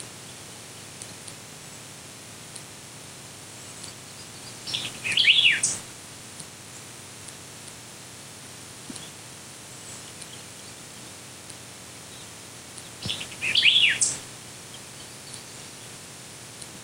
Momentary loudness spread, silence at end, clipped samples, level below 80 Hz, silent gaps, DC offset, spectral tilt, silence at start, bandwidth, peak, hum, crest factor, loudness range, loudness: 22 LU; 0 s; under 0.1%; -66 dBFS; none; under 0.1%; 0 dB/octave; 0 s; 16 kHz; -6 dBFS; none; 26 dB; 16 LU; -21 LUFS